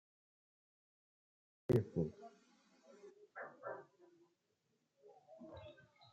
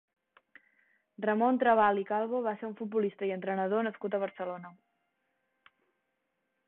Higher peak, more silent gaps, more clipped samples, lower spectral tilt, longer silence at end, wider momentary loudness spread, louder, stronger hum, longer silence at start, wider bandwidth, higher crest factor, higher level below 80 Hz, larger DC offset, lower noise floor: second, -22 dBFS vs -14 dBFS; neither; neither; about the same, -9 dB/octave vs -9.5 dB/octave; second, 0.3 s vs 1.95 s; first, 25 LU vs 14 LU; second, -42 LUFS vs -31 LUFS; neither; first, 1.7 s vs 1.2 s; first, 8.2 kHz vs 4.1 kHz; first, 26 dB vs 20 dB; about the same, -76 dBFS vs -78 dBFS; neither; about the same, -84 dBFS vs -81 dBFS